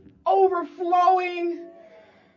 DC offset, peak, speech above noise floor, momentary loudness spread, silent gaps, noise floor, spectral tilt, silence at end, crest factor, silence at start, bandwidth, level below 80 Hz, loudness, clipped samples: under 0.1%; -8 dBFS; 29 dB; 11 LU; none; -52 dBFS; -5 dB/octave; 0.65 s; 16 dB; 0.25 s; 7 kHz; -72 dBFS; -22 LUFS; under 0.1%